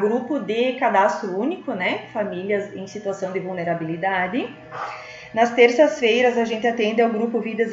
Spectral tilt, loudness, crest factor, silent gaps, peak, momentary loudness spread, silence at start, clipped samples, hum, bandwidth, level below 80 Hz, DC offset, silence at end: -5 dB/octave; -21 LUFS; 20 dB; none; -2 dBFS; 13 LU; 0 s; under 0.1%; none; 7.8 kHz; -66 dBFS; under 0.1%; 0 s